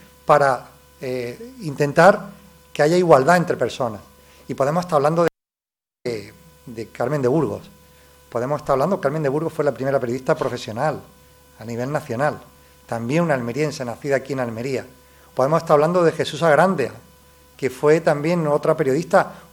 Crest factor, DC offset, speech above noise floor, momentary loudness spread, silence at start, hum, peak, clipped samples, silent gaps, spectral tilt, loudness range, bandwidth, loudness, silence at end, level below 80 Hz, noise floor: 20 dB; under 0.1%; over 71 dB; 16 LU; 0.3 s; none; 0 dBFS; under 0.1%; none; -6 dB/octave; 6 LU; 19.5 kHz; -20 LUFS; 0.1 s; -56 dBFS; under -90 dBFS